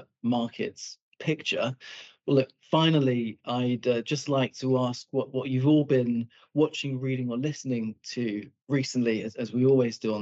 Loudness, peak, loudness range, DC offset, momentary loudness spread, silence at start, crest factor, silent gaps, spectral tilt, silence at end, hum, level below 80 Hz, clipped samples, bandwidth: -27 LUFS; -10 dBFS; 3 LU; under 0.1%; 10 LU; 0 s; 18 dB; 1.02-1.12 s; -6 dB/octave; 0 s; none; -84 dBFS; under 0.1%; 8 kHz